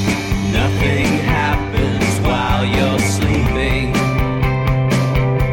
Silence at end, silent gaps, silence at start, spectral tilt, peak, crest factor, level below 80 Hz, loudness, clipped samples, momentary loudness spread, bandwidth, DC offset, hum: 0 s; none; 0 s; -5.5 dB/octave; -4 dBFS; 10 dB; -24 dBFS; -16 LUFS; under 0.1%; 2 LU; 17 kHz; under 0.1%; none